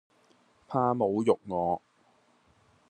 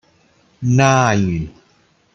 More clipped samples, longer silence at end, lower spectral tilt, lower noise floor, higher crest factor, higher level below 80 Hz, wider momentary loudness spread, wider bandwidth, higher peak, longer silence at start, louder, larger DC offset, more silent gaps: neither; first, 1.1 s vs 0.65 s; first, -8 dB/octave vs -6 dB/octave; first, -66 dBFS vs -57 dBFS; first, 22 dB vs 16 dB; second, -72 dBFS vs -46 dBFS; second, 7 LU vs 13 LU; first, 9.4 kHz vs 8 kHz; second, -10 dBFS vs -2 dBFS; about the same, 0.7 s vs 0.6 s; second, -29 LUFS vs -16 LUFS; neither; neither